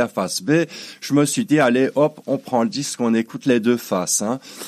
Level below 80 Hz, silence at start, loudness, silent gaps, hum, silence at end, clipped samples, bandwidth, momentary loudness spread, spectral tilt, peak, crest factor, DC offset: -72 dBFS; 0 s; -20 LUFS; none; none; 0 s; under 0.1%; 15 kHz; 6 LU; -4.5 dB/octave; -2 dBFS; 16 dB; under 0.1%